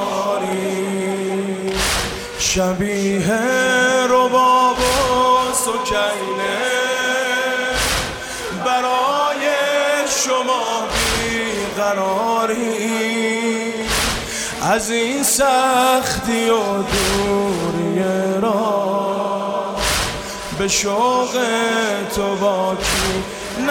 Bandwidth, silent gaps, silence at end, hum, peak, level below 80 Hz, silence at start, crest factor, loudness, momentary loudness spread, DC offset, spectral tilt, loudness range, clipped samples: 17.5 kHz; none; 0 s; none; -6 dBFS; -38 dBFS; 0 s; 12 dB; -18 LUFS; 7 LU; under 0.1%; -3 dB/octave; 4 LU; under 0.1%